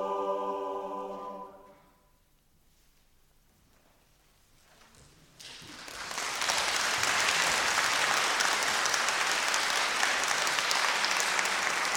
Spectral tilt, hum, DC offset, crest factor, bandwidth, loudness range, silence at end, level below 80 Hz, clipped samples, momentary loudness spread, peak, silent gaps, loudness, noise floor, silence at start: 0.5 dB/octave; none; under 0.1%; 26 dB; 17.5 kHz; 18 LU; 0 s; -66 dBFS; under 0.1%; 17 LU; -6 dBFS; none; -27 LUFS; -66 dBFS; 0 s